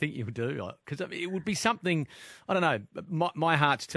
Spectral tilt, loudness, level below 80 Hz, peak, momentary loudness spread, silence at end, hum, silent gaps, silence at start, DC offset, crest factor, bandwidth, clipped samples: -5 dB/octave; -30 LUFS; -68 dBFS; -6 dBFS; 13 LU; 0 s; none; none; 0 s; under 0.1%; 24 dB; 11 kHz; under 0.1%